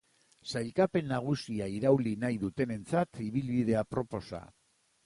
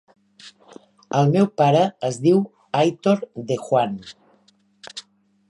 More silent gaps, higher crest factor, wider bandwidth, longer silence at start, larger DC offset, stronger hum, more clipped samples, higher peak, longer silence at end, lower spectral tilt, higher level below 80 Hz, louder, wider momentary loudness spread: neither; about the same, 18 dB vs 16 dB; about the same, 11.5 kHz vs 11 kHz; about the same, 0.45 s vs 0.45 s; neither; neither; neither; second, -14 dBFS vs -6 dBFS; about the same, 0.6 s vs 0.5 s; about the same, -7 dB/octave vs -7 dB/octave; first, -60 dBFS vs -68 dBFS; second, -32 LUFS vs -20 LUFS; second, 10 LU vs 19 LU